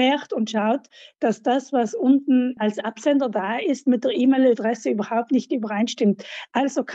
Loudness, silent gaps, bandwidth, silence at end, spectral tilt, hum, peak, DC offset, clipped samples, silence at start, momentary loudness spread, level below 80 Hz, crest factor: -22 LUFS; none; 8 kHz; 0 s; -5.5 dB/octave; none; -6 dBFS; under 0.1%; under 0.1%; 0 s; 7 LU; -80 dBFS; 14 dB